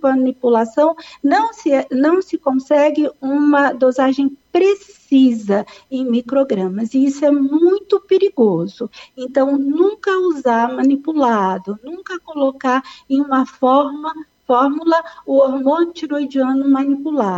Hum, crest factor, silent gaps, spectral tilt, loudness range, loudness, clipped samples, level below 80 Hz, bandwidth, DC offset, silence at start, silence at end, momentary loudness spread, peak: none; 12 dB; none; -6.5 dB/octave; 2 LU; -16 LUFS; under 0.1%; -64 dBFS; 8 kHz; under 0.1%; 0 s; 0 s; 8 LU; -4 dBFS